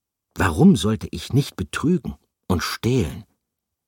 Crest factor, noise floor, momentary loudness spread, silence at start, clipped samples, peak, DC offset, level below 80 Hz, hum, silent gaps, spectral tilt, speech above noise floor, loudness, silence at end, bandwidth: 18 dB; -80 dBFS; 14 LU; 0.35 s; under 0.1%; -4 dBFS; under 0.1%; -40 dBFS; none; none; -6 dB/octave; 60 dB; -21 LUFS; 0.65 s; 17 kHz